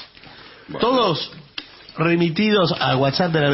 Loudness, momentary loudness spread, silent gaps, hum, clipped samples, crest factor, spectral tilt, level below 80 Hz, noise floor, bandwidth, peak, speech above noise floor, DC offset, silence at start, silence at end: -19 LUFS; 17 LU; none; none; under 0.1%; 14 dB; -9 dB/octave; -54 dBFS; -43 dBFS; 6 kHz; -6 dBFS; 25 dB; under 0.1%; 0 s; 0 s